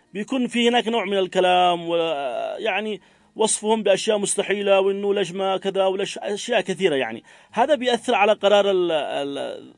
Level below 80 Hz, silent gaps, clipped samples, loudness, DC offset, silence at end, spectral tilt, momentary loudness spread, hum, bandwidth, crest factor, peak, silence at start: -72 dBFS; none; under 0.1%; -21 LUFS; under 0.1%; 0.1 s; -3 dB/octave; 9 LU; none; 11 kHz; 18 dB; -4 dBFS; 0.15 s